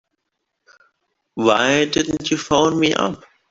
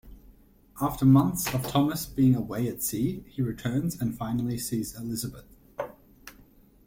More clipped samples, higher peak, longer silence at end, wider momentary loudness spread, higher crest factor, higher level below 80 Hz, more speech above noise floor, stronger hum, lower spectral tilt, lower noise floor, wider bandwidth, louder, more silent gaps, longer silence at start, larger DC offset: neither; first, -2 dBFS vs -8 dBFS; second, 0.35 s vs 0.55 s; second, 9 LU vs 16 LU; about the same, 18 dB vs 20 dB; about the same, -52 dBFS vs -52 dBFS; first, 59 dB vs 30 dB; neither; second, -4 dB/octave vs -6 dB/octave; first, -76 dBFS vs -56 dBFS; second, 7.8 kHz vs 16.5 kHz; first, -18 LUFS vs -27 LUFS; neither; first, 1.35 s vs 0.05 s; neither